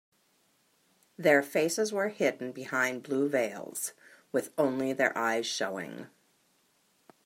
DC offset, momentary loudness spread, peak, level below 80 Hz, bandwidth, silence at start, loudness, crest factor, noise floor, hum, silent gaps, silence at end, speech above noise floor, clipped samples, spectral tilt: under 0.1%; 11 LU; -10 dBFS; -84 dBFS; 16 kHz; 1.2 s; -30 LUFS; 22 dB; -70 dBFS; none; none; 1.2 s; 40 dB; under 0.1%; -3.5 dB/octave